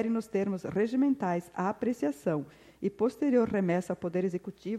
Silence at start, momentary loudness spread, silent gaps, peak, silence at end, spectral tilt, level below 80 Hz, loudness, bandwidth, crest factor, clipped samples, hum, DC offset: 0 s; 8 LU; none; -14 dBFS; 0 s; -8 dB/octave; -68 dBFS; -31 LUFS; 14 kHz; 16 dB; under 0.1%; none; under 0.1%